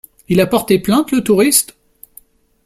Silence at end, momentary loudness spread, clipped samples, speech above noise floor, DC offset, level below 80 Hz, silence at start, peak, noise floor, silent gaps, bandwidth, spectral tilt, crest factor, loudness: 1 s; 5 LU; under 0.1%; 33 dB; under 0.1%; -48 dBFS; 0.3 s; 0 dBFS; -46 dBFS; none; 16.5 kHz; -4 dB/octave; 16 dB; -13 LUFS